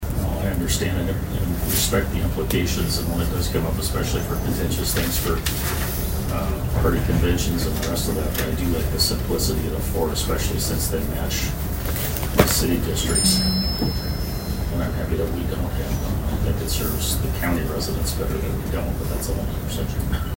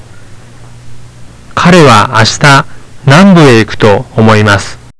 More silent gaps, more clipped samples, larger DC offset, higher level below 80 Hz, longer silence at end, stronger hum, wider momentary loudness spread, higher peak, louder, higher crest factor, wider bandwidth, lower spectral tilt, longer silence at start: neither; second, under 0.1% vs 9%; neither; about the same, -28 dBFS vs -32 dBFS; about the same, 0 s vs 0.1 s; neither; about the same, 6 LU vs 8 LU; about the same, 0 dBFS vs 0 dBFS; second, -23 LUFS vs -5 LUFS; first, 22 dB vs 6 dB; first, 16.5 kHz vs 11 kHz; about the same, -4.5 dB/octave vs -5.5 dB/octave; about the same, 0 s vs 0 s